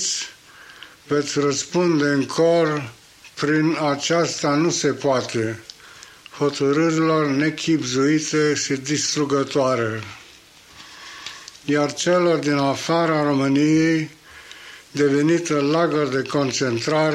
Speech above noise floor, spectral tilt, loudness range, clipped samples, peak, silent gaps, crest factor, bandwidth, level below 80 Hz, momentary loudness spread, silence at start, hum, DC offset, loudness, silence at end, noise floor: 28 dB; -4.5 dB/octave; 3 LU; under 0.1%; -8 dBFS; none; 12 dB; 12.5 kHz; -62 dBFS; 17 LU; 0 s; none; under 0.1%; -20 LUFS; 0 s; -47 dBFS